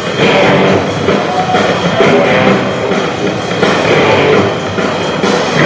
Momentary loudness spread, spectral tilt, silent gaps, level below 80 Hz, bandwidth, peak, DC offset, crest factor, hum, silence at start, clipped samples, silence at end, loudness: 6 LU; -5 dB/octave; none; -40 dBFS; 8 kHz; 0 dBFS; under 0.1%; 10 dB; none; 0 s; 0.1%; 0 s; -10 LUFS